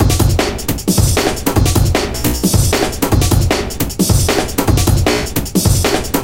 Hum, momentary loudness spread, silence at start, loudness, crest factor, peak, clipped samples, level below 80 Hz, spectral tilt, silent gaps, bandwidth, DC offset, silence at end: none; 4 LU; 0 s; -14 LUFS; 14 dB; 0 dBFS; under 0.1%; -20 dBFS; -4.5 dB/octave; none; 17 kHz; under 0.1%; 0 s